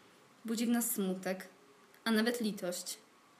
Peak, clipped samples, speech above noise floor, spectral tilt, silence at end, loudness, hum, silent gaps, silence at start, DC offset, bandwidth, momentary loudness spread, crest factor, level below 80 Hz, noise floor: -18 dBFS; under 0.1%; 27 dB; -4 dB/octave; 0.4 s; -35 LUFS; none; none; 0.45 s; under 0.1%; 15.5 kHz; 13 LU; 18 dB; -90 dBFS; -62 dBFS